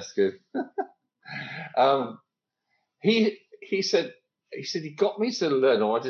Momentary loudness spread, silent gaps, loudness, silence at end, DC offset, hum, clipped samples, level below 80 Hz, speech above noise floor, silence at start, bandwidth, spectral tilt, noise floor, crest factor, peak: 15 LU; none; -26 LUFS; 0 s; under 0.1%; none; under 0.1%; -80 dBFS; 55 dB; 0 s; 7.2 kHz; -4.5 dB/octave; -80 dBFS; 18 dB; -10 dBFS